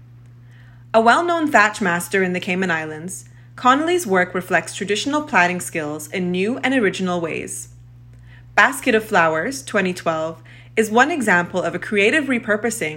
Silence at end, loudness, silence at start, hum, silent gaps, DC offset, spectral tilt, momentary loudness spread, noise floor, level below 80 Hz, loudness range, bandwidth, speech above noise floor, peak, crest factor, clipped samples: 0 s; -19 LUFS; 0 s; none; none; under 0.1%; -4 dB/octave; 11 LU; -43 dBFS; -56 dBFS; 3 LU; 16.5 kHz; 24 dB; 0 dBFS; 20 dB; under 0.1%